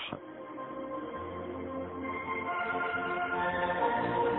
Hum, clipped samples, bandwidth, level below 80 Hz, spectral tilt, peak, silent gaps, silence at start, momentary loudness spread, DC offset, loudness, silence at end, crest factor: none; under 0.1%; 4.2 kHz; -62 dBFS; -9 dB/octave; -18 dBFS; none; 0 s; 11 LU; under 0.1%; -34 LUFS; 0 s; 16 dB